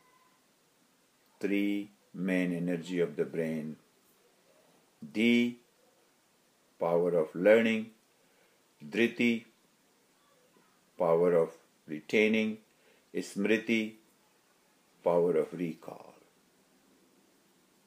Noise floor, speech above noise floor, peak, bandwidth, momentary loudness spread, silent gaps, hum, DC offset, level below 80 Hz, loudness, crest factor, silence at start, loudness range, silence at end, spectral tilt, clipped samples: -69 dBFS; 39 dB; -12 dBFS; 15.5 kHz; 18 LU; none; none; under 0.1%; -82 dBFS; -30 LUFS; 22 dB; 1.4 s; 6 LU; 1.9 s; -6 dB/octave; under 0.1%